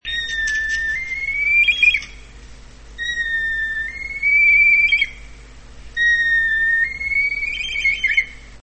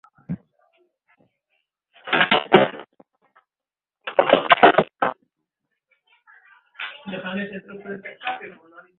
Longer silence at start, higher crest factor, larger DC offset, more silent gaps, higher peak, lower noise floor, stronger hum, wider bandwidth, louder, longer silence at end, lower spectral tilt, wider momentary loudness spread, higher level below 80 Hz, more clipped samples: second, 0.05 s vs 0.3 s; second, 14 dB vs 24 dB; first, 0.3% vs under 0.1%; neither; second, -4 dBFS vs 0 dBFS; second, -40 dBFS vs under -90 dBFS; neither; first, 8.8 kHz vs 4.4 kHz; first, -16 LUFS vs -19 LUFS; second, 0.05 s vs 0.5 s; second, -0.5 dB/octave vs -8 dB/octave; second, 12 LU vs 21 LU; first, -40 dBFS vs -64 dBFS; neither